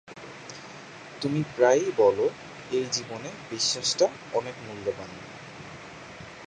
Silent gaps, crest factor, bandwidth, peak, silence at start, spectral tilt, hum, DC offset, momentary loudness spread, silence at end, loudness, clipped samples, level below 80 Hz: none; 22 dB; 10 kHz; -8 dBFS; 0.1 s; -3.5 dB/octave; none; under 0.1%; 20 LU; 0 s; -26 LUFS; under 0.1%; -64 dBFS